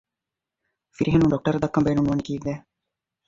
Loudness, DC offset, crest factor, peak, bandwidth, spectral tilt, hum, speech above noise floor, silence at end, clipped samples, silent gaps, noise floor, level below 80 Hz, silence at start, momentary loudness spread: -23 LUFS; under 0.1%; 18 dB; -6 dBFS; 7.6 kHz; -8 dB/octave; none; 65 dB; 0.65 s; under 0.1%; none; -87 dBFS; -46 dBFS; 1 s; 11 LU